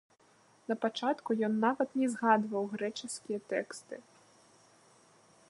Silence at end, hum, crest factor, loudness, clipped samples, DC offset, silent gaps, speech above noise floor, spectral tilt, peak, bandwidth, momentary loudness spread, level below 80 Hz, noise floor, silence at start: 1.5 s; none; 22 dB; -33 LUFS; under 0.1%; under 0.1%; none; 33 dB; -4.5 dB/octave; -12 dBFS; 11.5 kHz; 16 LU; -84 dBFS; -65 dBFS; 0.7 s